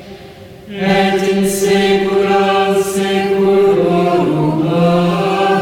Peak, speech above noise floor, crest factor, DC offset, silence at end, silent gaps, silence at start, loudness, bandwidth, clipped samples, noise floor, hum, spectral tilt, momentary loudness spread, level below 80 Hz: -2 dBFS; 22 dB; 10 dB; under 0.1%; 0 s; none; 0 s; -13 LUFS; 17 kHz; under 0.1%; -35 dBFS; none; -5.5 dB/octave; 3 LU; -46 dBFS